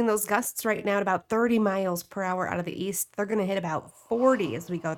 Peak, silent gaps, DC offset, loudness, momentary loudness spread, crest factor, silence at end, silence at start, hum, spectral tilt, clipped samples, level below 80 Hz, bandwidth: -8 dBFS; none; under 0.1%; -27 LUFS; 7 LU; 18 dB; 0 s; 0 s; none; -4.5 dB/octave; under 0.1%; -66 dBFS; 19 kHz